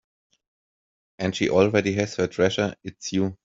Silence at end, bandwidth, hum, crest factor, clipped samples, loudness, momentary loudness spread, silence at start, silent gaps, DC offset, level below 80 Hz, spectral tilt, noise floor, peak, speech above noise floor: 0.1 s; 7.8 kHz; none; 22 dB; under 0.1%; -24 LUFS; 9 LU; 1.2 s; none; under 0.1%; -60 dBFS; -5.5 dB/octave; under -90 dBFS; -4 dBFS; over 67 dB